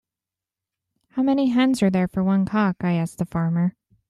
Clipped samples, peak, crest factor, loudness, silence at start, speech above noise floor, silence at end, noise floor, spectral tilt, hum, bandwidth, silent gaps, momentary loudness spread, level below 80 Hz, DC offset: under 0.1%; -8 dBFS; 16 dB; -22 LUFS; 1.15 s; 68 dB; 0.4 s; -89 dBFS; -7.5 dB/octave; none; 12.5 kHz; none; 6 LU; -56 dBFS; under 0.1%